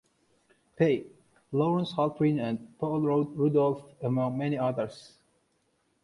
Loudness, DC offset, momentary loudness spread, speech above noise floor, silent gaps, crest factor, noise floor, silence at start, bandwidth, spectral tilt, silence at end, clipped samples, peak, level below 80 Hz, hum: -29 LUFS; under 0.1%; 8 LU; 45 dB; none; 18 dB; -73 dBFS; 0.8 s; 11 kHz; -8.5 dB/octave; 1 s; under 0.1%; -12 dBFS; -68 dBFS; none